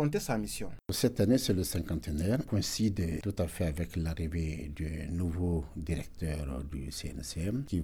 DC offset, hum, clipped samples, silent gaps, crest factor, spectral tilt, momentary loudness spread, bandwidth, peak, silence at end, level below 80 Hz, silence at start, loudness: under 0.1%; none; under 0.1%; none; 18 dB; -5.5 dB/octave; 10 LU; 18.5 kHz; -14 dBFS; 0 s; -44 dBFS; 0 s; -33 LUFS